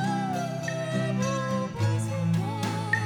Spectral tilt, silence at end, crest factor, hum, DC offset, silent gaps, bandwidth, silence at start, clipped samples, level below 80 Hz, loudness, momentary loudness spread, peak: -6 dB/octave; 0 s; 16 dB; none; under 0.1%; none; 17 kHz; 0 s; under 0.1%; -62 dBFS; -28 LUFS; 3 LU; -10 dBFS